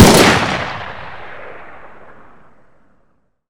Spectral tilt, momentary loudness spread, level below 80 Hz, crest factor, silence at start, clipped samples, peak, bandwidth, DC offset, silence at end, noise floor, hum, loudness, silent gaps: -4 dB/octave; 26 LU; -34 dBFS; 16 dB; 0 s; 0.8%; 0 dBFS; over 20 kHz; under 0.1%; 1.9 s; -60 dBFS; none; -12 LUFS; none